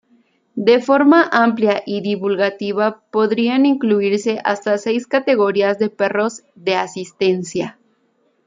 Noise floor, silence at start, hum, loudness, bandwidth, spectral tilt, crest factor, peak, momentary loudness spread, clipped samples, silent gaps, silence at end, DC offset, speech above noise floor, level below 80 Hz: -62 dBFS; 0.55 s; none; -17 LUFS; 9.4 kHz; -5.5 dB/octave; 16 dB; -2 dBFS; 9 LU; under 0.1%; none; 0.75 s; under 0.1%; 46 dB; -66 dBFS